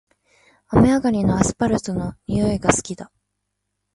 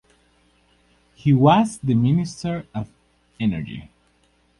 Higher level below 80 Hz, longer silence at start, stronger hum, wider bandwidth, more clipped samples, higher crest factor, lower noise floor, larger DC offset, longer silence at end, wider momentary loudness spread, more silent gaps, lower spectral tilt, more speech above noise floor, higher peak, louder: first, -40 dBFS vs -52 dBFS; second, 0.7 s vs 1.25 s; about the same, 50 Hz at -40 dBFS vs 60 Hz at -45 dBFS; about the same, 11.5 kHz vs 11.5 kHz; neither; about the same, 20 dB vs 18 dB; first, -77 dBFS vs -62 dBFS; neither; about the same, 0.9 s vs 0.8 s; second, 11 LU vs 18 LU; neither; second, -6 dB/octave vs -7.5 dB/octave; first, 58 dB vs 42 dB; first, 0 dBFS vs -4 dBFS; about the same, -20 LUFS vs -21 LUFS